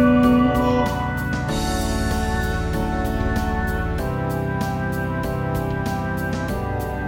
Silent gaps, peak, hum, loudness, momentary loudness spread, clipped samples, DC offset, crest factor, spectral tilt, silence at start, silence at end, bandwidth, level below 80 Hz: none; -6 dBFS; none; -22 LUFS; 7 LU; under 0.1%; under 0.1%; 16 dB; -6.5 dB/octave; 0 s; 0 s; 17 kHz; -30 dBFS